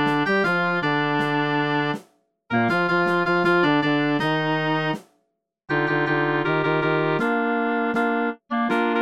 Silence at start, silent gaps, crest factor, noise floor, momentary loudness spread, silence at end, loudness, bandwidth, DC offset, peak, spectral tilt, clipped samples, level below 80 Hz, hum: 0 s; none; 16 dB; -72 dBFS; 6 LU; 0 s; -22 LUFS; 11.5 kHz; 0.3%; -6 dBFS; -7 dB/octave; under 0.1%; -64 dBFS; none